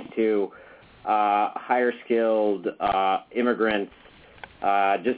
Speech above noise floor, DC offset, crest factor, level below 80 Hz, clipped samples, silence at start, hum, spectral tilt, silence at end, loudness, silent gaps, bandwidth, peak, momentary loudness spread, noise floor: 23 dB; under 0.1%; 16 dB; -60 dBFS; under 0.1%; 0 s; none; -8.5 dB/octave; 0 s; -24 LUFS; none; 4 kHz; -10 dBFS; 7 LU; -47 dBFS